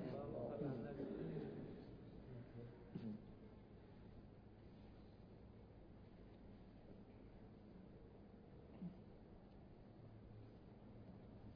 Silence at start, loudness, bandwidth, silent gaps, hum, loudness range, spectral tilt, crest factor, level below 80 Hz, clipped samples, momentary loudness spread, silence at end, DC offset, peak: 0 s; -56 LUFS; 5 kHz; none; none; 11 LU; -8.5 dB/octave; 22 dB; -68 dBFS; under 0.1%; 14 LU; 0 s; under 0.1%; -34 dBFS